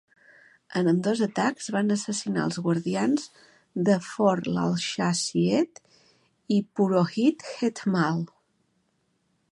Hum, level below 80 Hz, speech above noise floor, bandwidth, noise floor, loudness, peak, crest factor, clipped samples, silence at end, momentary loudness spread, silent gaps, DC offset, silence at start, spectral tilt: none; -70 dBFS; 47 dB; 11.5 kHz; -72 dBFS; -26 LUFS; -8 dBFS; 18 dB; under 0.1%; 1.25 s; 6 LU; none; under 0.1%; 0.7 s; -5.5 dB/octave